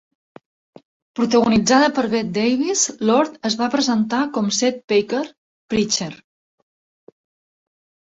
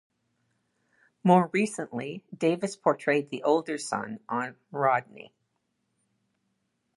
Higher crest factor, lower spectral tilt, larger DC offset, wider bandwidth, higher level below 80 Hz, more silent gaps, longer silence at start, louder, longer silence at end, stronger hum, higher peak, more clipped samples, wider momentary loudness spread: about the same, 18 dB vs 22 dB; second, -3.5 dB/octave vs -6 dB/octave; neither; second, 8 kHz vs 11.5 kHz; first, -56 dBFS vs -80 dBFS; first, 4.84-4.88 s, 5.38-5.68 s vs none; about the same, 1.15 s vs 1.25 s; first, -19 LUFS vs -27 LUFS; first, 1.95 s vs 1.7 s; neither; first, -4 dBFS vs -8 dBFS; neither; second, 9 LU vs 12 LU